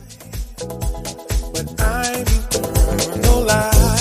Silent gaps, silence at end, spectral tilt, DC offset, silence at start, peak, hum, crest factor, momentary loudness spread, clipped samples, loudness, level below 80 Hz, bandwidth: none; 0 s; -4 dB/octave; under 0.1%; 0 s; -2 dBFS; none; 16 dB; 15 LU; under 0.1%; -19 LUFS; -20 dBFS; 15.5 kHz